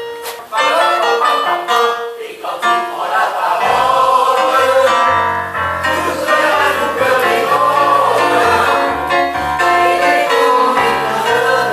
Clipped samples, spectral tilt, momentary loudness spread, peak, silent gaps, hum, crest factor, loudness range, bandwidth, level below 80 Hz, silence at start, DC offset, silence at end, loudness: under 0.1%; -3 dB/octave; 6 LU; 0 dBFS; none; none; 12 dB; 2 LU; 15.5 kHz; -46 dBFS; 0 s; under 0.1%; 0 s; -13 LUFS